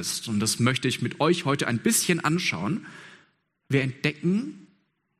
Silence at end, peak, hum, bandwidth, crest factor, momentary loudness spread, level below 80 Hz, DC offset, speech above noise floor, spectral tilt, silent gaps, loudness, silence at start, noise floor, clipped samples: 0.55 s; -6 dBFS; none; 15.5 kHz; 20 dB; 8 LU; -64 dBFS; under 0.1%; 42 dB; -4 dB/octave; none; -25 LUFS; 0 s; -67 dBFS; under 0.1%